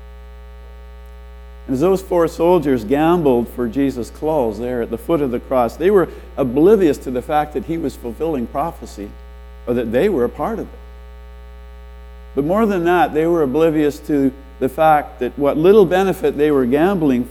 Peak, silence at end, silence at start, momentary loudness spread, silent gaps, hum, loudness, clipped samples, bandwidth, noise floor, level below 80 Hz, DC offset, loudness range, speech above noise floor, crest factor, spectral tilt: 0 dBFS; 0 s; 0 s; 10 LU; none; 60 Hz at -35 dBFS; -17 LUFS; under 0.1%; 18.5 kHz; -36 dBFS; -36 dBFS; under 0.1%; 7 LU; 20 dB; 18 dB; -7 dB/octave